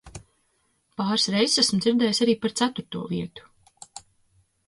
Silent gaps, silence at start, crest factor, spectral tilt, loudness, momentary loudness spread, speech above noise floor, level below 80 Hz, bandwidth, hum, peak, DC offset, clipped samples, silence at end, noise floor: none; 0.05 s; 18 dB; -3.5 dB/octave; -23 LUFS; 23 LU; 46 dB; -60 dBFS; 11.5 kHz; none; -8 dBFS; under 0.1%; under 0.1%; 0.7 s; -69 dBFS